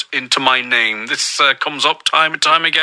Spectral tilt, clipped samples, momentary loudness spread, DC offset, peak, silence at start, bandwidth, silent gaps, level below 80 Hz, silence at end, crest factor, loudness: -0.5 dB/octave; under 0.1%; 4 LU; under 0.1%; 0 dBFS; 0 s; 10.5 kHz; none; -74 dBFS; 0 s; 16 dB; -14 LUFS